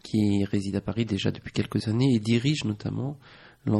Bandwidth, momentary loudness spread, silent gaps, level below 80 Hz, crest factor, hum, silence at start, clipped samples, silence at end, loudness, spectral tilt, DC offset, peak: 12 kHz; 9 LU; none; -54 dBFS; 16 dB; none; 0.05 s; under 0.1%; 0 s; -27 LUFS; -6.5 dB/octave; under 0.1%; -10 dBFS